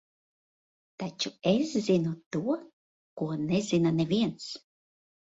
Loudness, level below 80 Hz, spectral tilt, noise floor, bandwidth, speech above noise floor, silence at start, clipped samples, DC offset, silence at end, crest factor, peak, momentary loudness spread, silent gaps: -29 LUFS; -68 dBFS; -6 dB/octave; under -90 dBFS; 8 kHz; over 62 dB; 1 s; under 0.1%; under 0.1%; 0.8 s; 18 dB; -12 dBFS; 13 LU; 2.26-2.31 s, 2.73-3.17 s